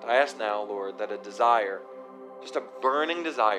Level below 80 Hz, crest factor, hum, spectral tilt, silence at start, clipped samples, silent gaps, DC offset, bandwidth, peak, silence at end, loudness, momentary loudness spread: under -90 dBFS; 20 dB; none; -3 dB/octave; 0 s; under 0.1%; none; under 0.1%; 11.5 kHz; -8 dBFS; 0 s; -27 LUFS; 19 LU